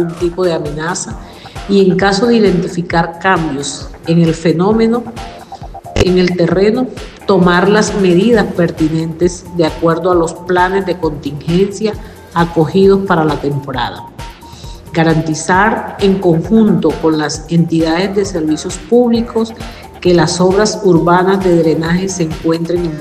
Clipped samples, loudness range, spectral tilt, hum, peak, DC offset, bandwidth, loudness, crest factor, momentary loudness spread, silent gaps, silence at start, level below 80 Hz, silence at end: under 0.1%; 3 LU; -6 dB/octave; none; 0 dBFS; under 0.1%; 14 kHz; -13 LUFS; 12 dB; 12 LU; none; 0 s; -34 dBFS; 0 s